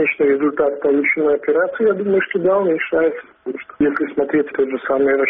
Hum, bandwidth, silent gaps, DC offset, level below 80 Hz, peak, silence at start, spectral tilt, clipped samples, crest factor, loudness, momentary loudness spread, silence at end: none; 3.8 kHz; none; under 0.1%; -56 dBFS; -6 dBFS; 0 s; -5 dB/octave; under 0.1%; 12 dB; -17 LUFS; 5 LU; 0 s